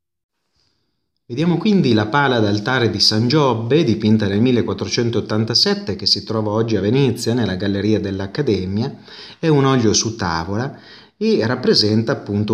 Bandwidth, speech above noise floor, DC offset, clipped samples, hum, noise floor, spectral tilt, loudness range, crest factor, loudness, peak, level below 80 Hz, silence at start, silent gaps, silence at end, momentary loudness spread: 14 kHz; 55 dB; under 0.1%; under 0.1%; none; -72 dBFS; -5 dB/octave; 3 LU; 16 dB; -17 LUFS; -2 dBFS; -52 dBFS; 1.3 s; none; 0 s; 8 LU